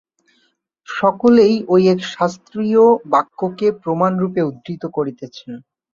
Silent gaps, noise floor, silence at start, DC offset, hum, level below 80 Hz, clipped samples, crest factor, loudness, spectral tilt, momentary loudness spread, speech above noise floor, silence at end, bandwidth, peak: none; -64 dBFS; 0.9 s; under 0.1%; none; -60 dBFS; under 0.1%; 16 dB; -16 LUFS; -7 dB/octave; 17 LU; 48 dB; 0.35 s; 7.4 kHz; -2 dBFS